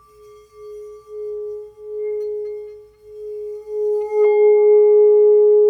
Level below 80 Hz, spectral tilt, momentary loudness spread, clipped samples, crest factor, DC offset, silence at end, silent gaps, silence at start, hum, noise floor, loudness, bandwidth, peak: -62 dBFS; -6.5 dB/octave; 24 LU; under 0.1%; 10 dB; under 0.1%; 0 s; none; 0.6 s; none; -46 dBFS; -15 LUFS; 2.3 kHz; -6 dBFS